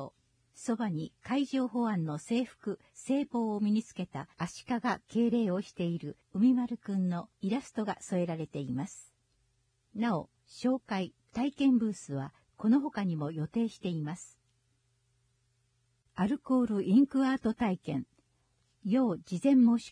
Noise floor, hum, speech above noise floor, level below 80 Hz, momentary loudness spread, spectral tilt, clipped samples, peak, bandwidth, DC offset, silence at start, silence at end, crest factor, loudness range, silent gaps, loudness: -74 dBFS; none; 43 dB; -68 dBFS; 13 LU; -7 dB/octave; under 0.1%; -16 dBFS; 10.5 kHz; under 0.1%; 0 s; 0 s; 16 dB; 6 LU; none; -32 LUFS